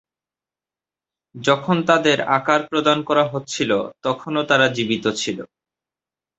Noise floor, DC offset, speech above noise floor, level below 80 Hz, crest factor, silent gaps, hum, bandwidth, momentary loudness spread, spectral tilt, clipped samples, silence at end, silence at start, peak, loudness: under -90 dBFS; under 0.1%; over 71 dB; -62 dBFS; 20 dB; none; none; 8.2 kHz; 8 LU; -4.5 dB/octave; under 0.1%; 0.95 s; 1.35 s; -2 dBFS; -19 LUFS